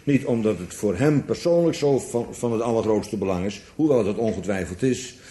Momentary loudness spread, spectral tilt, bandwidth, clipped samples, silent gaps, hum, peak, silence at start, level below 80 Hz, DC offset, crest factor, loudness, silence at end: 7 LU; -6.5 dB/octave; 12 kHz; under 0.1%; none; none; -6 dBFS; 0.05 s; -52 dBFS; under 0.1%; 16 dB; -23 LUFS; 0 s